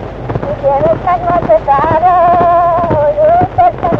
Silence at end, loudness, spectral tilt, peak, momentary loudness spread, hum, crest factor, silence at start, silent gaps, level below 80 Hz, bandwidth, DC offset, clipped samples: 0 s; -10 LUFS; -9 dB/octave; 0 dBFS; 6 LU; none; 10 dB; 0 s; none; -30 dBFS; 5.8 kHz; under 0.1%; under 0.1%